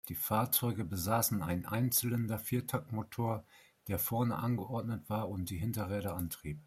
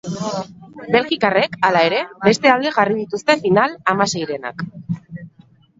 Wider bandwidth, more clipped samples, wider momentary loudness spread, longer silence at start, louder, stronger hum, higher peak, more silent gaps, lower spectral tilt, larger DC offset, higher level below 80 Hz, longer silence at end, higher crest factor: first, 16 kHz vs 8 kHz; neither; second, 8 LU vs 14 LU; about the same, 0.05 s vs 0.05 s; second, -35 LUFS vs -17 LUFS; neither; second, -18 dBFS vs 0 dBFS; neither; about the same, -5 dB/octave vs -4.5 dB/octave; neither; about the same, -62 dBFS vs -58 dBFS; second, 0.05 s vs 0.5 s; about the same, 18 dB vs 18 dB